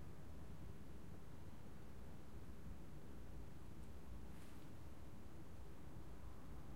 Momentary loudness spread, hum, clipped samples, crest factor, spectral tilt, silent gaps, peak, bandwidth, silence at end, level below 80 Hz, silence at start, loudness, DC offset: 2 LU; none; under 0.1%; 14 dB; -6.5 dB/octave; none; -40 dBFS; 16 kHz; 0 s; -62 dBFS; 0 s; -59 LUFS; 0.3%